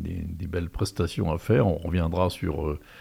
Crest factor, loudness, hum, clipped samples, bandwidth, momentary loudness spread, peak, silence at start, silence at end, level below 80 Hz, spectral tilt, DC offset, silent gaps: 16 dB; -27 LUFS; none; under 0.1%; 16 kHz; 9 LU; -10 dBFS; 0 s; 0 s; -42 dBFS; -7 dB/octave; under 0.1%; none